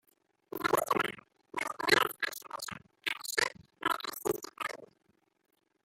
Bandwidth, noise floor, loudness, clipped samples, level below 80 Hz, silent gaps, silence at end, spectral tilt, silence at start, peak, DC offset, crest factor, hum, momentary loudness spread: 16.5 kHz; -74 dBFS; -33 LUFS; under 0.1%; -72 dBFS; none; 1 s; -2 dB/octave; 0.55 s; -10 dBFS; under 0.1%; 26 dB; none; 15 LU